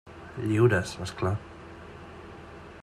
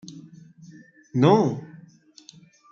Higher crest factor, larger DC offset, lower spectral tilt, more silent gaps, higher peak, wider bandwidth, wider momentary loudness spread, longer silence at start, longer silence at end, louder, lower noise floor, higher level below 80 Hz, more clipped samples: about the same, 20 dB vs 22 dB; neither; about the same, -6.5 dB/octave vs -7.5 dB/octave; neither; second, -10 dBFS vs -4 dBFS; first, 13 kHz vs 7.4 kHz; second, 22 LU vs 27 LU; about the same, 0.05 s vs 0.1 s; second, 0 s vs 0.95 s; second, -27 LUFS vs -21 LUFS; second, -45 dBFS vs -52 dBFS; first, -56 dBFS vs -66 dBFS; neither